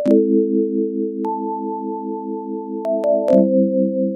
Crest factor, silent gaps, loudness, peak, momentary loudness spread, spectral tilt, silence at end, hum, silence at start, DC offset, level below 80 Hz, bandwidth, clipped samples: 18 dB; none; -19 LUFS; -2 dBFS; 12 LU; -10.5 dB/octave; 0 s; none; 0 s; under 0.1%; -68 dBFS; 6 kHz; under 0.1%